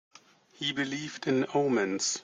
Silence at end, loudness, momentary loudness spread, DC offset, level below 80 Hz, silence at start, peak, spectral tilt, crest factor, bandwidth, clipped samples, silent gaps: 0 s; -30 LUFS; 7 LU; under 0.1%; -74 dBFS; 0.6 s; -16 dBFS; -3.5 dB/octave; 16 dB; 9.6 kHz; under 0.1%; none